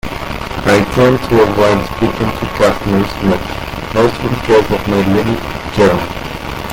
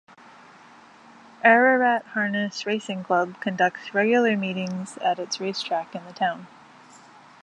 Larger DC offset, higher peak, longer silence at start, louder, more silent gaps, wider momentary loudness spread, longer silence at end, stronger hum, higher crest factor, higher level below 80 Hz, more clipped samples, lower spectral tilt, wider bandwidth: neither; about the same, 0 dBFS vs -2 dBFS; second, 0.05 s vs 1.45 s; first, -14 LUFS vs -23 LUFS; neither; about the same, 11 LU vs 11 LU; second, 0 s vs 1 s; neither; second, 14 dB vs 22 dB; first, -30 dBFS vs -78 dBFS; neither; first, -6 dB/octave vs -4.5 dB/octave; first, 17 kHz vs 10.5 kHz